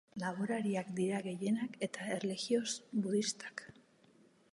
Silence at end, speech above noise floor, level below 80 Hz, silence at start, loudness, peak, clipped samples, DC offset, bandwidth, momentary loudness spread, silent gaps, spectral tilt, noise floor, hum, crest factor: 0.8 s; 30 dB; -82 dBFS; 0.15 s; -37 LUFS; -20 dBFS; under 0.1%; under 0.1%; 11.5 kHz; 8 LU; none; -4.5 dB/octave; -66 dBFS; none; 18 dB